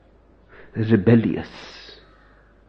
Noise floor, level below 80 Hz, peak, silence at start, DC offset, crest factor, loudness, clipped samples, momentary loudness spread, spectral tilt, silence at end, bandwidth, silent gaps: -53 dBFS; -52 dBFS; -2 dBFS; 0.75 s; under 0.1%; 20 dB; -19 LUFS; under 0.1%; 23 LU; -9 dB/octave; 0.9 s; 6.2 kHz; none